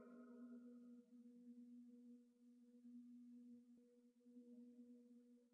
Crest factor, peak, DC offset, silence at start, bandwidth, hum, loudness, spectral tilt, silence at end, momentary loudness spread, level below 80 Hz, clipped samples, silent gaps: 12 dB; -52 dBFS; under 0.1%; 0 s; 2.4 kHz; none; -65 LUFS; -6 dB/octave; 0 s; 7 LU; under -90 dBFS; under 0.1%; none